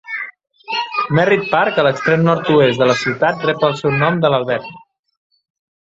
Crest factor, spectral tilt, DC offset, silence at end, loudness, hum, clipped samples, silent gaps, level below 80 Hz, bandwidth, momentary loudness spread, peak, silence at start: 16 dB; -6 dB/octave; under 0.1%; 1.05 s; -15 LUFS; none; under 0.1%; none; -54 dBFS; 7.8 kHz; 10 LU; 0 dBFS; 0.05 s